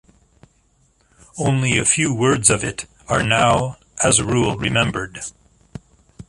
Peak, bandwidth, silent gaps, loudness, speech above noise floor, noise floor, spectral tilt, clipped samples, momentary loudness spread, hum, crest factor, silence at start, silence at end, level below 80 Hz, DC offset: 0 dBFS; 11.5 kHz; none; -18 LUFS; 42 dB; -60 dBFS; -3.5 dB/octave; under 0.1%; 14 LU; none; 20 dB; 1.35 s; 0.05 s; -44 dBFS; under 0.1%